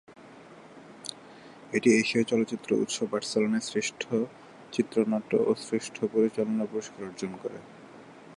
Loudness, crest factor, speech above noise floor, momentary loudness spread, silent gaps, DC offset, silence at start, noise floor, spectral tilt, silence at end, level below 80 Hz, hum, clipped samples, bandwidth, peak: -28 LUFS; 20 dB; 22 dB; 24 LU; none; under 0.1%; 0.1 s; -50 dBFS; -4.5 dB/octave; 0.05 s; -74 dBFS; none; under 0.1%; 11.5 kHz; -10 dBFS